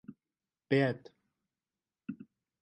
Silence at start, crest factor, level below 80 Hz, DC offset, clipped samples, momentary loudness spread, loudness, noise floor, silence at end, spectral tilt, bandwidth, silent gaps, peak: 0.1 s; 22 dB; -80 dBFS; under 0.1%; under 0.1%; 21 LU; -32 LUFS; under -90 dBFS; 0.4 s; -8 dB/octave; 9 kHz; none; -16 dBFS